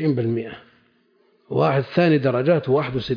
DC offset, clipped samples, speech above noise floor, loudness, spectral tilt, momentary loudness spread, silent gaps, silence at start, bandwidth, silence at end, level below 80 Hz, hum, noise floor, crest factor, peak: under 0.1%; under 0.1%; 41 dB; -20 LUFS; -9 dB/octave; 10 LU; none; 0 s; 5.2 kHz; 0 s; -56 dBFS; none; -61 dBFS; 16 dB; -6 dBFS